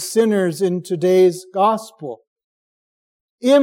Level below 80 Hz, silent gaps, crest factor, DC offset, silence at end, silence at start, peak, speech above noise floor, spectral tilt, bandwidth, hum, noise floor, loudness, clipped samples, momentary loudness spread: -76 dBFS; 2.27-2.36 s, 2.44-3.38 s; 14 dB; under 0.1%; 0 s; 0 s; -4 dBFS; over 73 dB; -5.5 dB/octave; 16.5 kHz; none; under -90 dBFS; -18 LUFS; under 0.1%; 18 LU